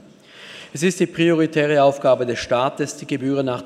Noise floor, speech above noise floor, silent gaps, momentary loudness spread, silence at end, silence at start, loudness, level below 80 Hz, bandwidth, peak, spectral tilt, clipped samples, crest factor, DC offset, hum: -44 dBFS; 25 dB; none; 11 LU; 0 s; 0.35 s; -19 LUFS; -58 dBFS; 14 kHz; -4 dBFS; -5.5 dB/octave; under 0.1%; 16 dB; under 0.1%; none